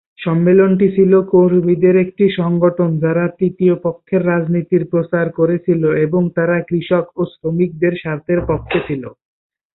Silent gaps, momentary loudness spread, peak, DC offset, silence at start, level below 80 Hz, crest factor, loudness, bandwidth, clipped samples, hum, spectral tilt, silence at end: none; 8 LU; -2 dBFS; under 0.1%; 0.2 s; -46 dBFS; 14 dB; -15 LUFS; 4.1 kHz; under 0.1%; none; -13.5 dB/octave; 0.6 s